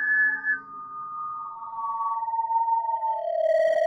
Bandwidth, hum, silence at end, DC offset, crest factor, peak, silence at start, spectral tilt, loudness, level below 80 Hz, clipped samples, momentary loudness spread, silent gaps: 7.4 kHz; none; 0 s; under 0.1%; 12 dB; -14 dBFS; 0 s; -3 dB/octave; -26 LUFS; -78 dBFS; under 0.1%; 13 LU; none